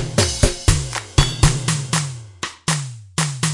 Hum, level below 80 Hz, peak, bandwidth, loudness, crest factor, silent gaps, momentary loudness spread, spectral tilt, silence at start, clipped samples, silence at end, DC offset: none; -26 dBFS; 0 dBFS; 11.5 kHz; -20 LUFS; 20 dB; none; 9 LU; -4 dB/octave; 0 s; under 0.1%; 0 s; under 0.1%